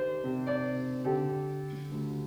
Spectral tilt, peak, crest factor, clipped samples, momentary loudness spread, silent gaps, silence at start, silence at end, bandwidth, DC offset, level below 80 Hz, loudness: -8.5 dB/octave; -18 dBFS; 14 dB; under 0.1%; 6 LU; none; 0 s; 0 s; over 20 kHz; under 0.1%; -64 dBFS; -33 LUFS